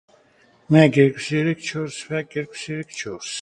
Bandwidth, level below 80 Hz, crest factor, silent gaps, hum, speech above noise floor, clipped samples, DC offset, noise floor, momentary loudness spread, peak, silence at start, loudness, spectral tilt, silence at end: 11 kHz; -60 dBFS; 22 dB; none; none; 36 dB; under 0.1%; under 0.1%; -57 dBFS; 15 LU; 0 dBFS; 0.7 s; -21 LUFS; -6 dB/octave; 0 s